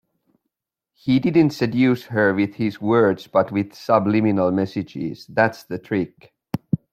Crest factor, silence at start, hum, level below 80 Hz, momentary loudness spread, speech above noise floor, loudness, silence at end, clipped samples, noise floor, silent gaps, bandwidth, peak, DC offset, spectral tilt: 18 dB; 1.05 s; none; -58 dBFS; 12 LU; 61 dB; -20 LUFS; 0.15 s; under 0.1%; -81 dBFS; none; 15 kHz; -2 dBFS; under 0.1%; -7.5 dB/octave